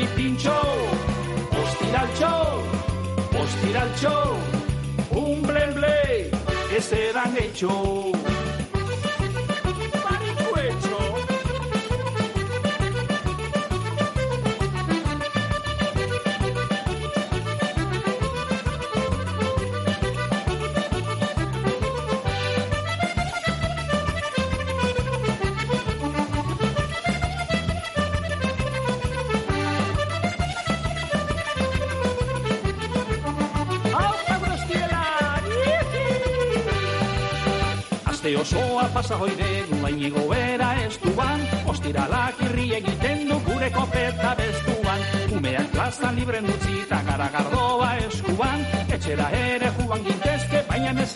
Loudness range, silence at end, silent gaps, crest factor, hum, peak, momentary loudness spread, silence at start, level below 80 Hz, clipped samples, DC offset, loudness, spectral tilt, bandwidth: 2 LU; 0 s; none; 14 dB; none; -10 dBFS; 4 LU; 0 s; -36 dBFS; under 0.1%; under 0.1%; -24 LUFS; -5.5 dB/octave; 11.5 kHz